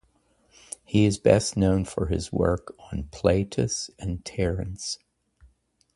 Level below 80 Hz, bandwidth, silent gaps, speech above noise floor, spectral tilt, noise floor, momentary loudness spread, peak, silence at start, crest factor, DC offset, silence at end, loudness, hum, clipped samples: -40 dBFS; 11.5 kHz; none; 41 dB; -5.5 dB/octave; -65 dBFS; 15 LU; -4 dBFS; 0.9 s; 22 dB; under 0.1%; 1 s; -26 LUFS; none; under 0.1%